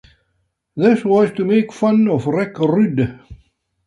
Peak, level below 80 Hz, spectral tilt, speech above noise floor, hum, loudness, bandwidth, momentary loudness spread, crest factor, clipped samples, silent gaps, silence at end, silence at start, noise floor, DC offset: -2 dBFS; -50 dBFS; -8 dB/octave; 53 dB; none; -16 LUFS; 10 kHz; 6 LU; 16 dB; under 0.1%; none; 0.55 s; 0.75 s; -68 dBFS; under 0.1%